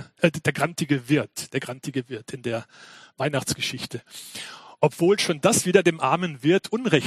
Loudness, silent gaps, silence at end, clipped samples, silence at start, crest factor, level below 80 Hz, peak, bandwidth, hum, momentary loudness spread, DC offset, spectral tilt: -24 LUFS; none; 0 s; under 0.1%; 0 s; 22 dB; -60 dBFS; -2 dBFS; 14.5 kHz; none; 15 LU; under 0.1%; -4.5 dB/octave